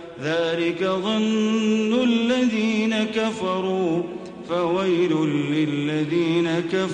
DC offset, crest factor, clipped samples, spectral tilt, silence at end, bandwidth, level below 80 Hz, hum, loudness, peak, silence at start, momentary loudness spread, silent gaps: under 0.1%; 12 dB; under 0.1%; -6 dB/octave; 0 s; 9.8 kHz; -62 dBFS; none; -22 LUFS; -10 dBFS; 0 s; 5 LU; none